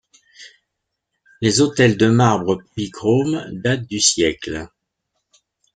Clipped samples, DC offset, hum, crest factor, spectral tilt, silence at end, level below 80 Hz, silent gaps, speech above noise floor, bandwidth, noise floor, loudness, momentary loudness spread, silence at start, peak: under 0.1%; under 0.1%; none; 18 dB; -4.5 dB/octave; 1.1 s; -50 dBFS; none; 60 dB; 9.4 kHz; -78 dBFS; -18 LUFS; 12 LU; 0.4 s; -2 dBFS